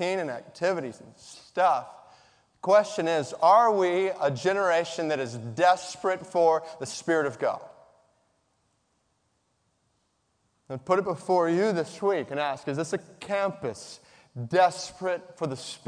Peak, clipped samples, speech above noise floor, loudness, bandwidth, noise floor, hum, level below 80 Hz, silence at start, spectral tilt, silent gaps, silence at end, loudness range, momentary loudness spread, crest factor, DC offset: -8 dBFS; under 0.1%; 47 dB; -26 LUFS; 10 kHz; -73 dBFS; none; -74 dBFS; 0 s; -5 dB/octave; none; 0.1 s; 9 LU; 13 LU; 20 dB; under 0.1%